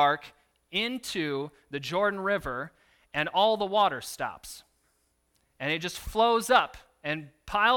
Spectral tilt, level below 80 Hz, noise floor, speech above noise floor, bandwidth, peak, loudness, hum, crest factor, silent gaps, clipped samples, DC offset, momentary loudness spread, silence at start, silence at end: -3.5 dB/octave; -54 dBFS; -72 dBFS; 44 dB; 19 kHz; -8 dBFS; -28 LUFS; none; 22 dB; none; under 0.1%; under 0.1%; 13 LU; 0 s; 0 s